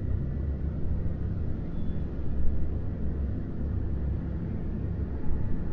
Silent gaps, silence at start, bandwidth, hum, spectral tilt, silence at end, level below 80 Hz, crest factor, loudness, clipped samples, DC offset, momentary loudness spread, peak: none; 0 s; 2.7 kHz; none; -11.5 dB/octave; 0 s; -32 dBFS; 16 dB; -33 LUFS; under 0.1%; under 0.1%; 2 LU; -10 dBFS